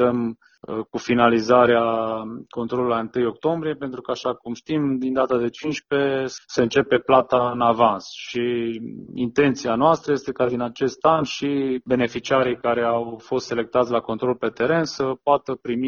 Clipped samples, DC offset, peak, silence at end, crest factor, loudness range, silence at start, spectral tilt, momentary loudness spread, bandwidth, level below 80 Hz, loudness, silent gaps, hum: under 0.1%; under 0.1%; -2 dBFS; 0 s; 20 dB; 3 LU; 0 s; -6 dB/octave; 11 LU; 7.2 kHz; -58 dBFS; -22 LUFS; none; none